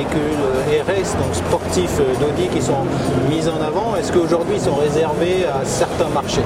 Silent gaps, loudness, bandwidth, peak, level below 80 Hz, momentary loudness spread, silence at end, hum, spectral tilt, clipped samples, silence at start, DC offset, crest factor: none; -18 LUFS; 16 kHz; -2 dBFS; -38 dBFS; 2 LU; 0 s; none; -5.5 dB/octave; under 0.1%; 0 s; under 0.1%; 14 dB